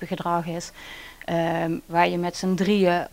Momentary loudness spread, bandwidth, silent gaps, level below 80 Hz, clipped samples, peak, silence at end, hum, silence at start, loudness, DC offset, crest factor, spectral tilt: 16 LU; 16 kHz; none; -54 dBFS; under 0.1%; -4 dBFS; 0.05 s; none; 0 s; -24 LUFS; under 0.1%; 20 dB; -6 dB/octave